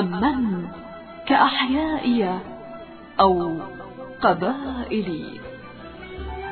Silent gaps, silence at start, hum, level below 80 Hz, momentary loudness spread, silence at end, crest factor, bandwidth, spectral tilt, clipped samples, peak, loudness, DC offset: none; 0 s; none; -46 dBFS; 20 LU; 0 s; 20 dB; 4.5 kHz; -9.5 dB/octave; under 0.1%; -4 dBFS; -22 LUFS; under 0.1%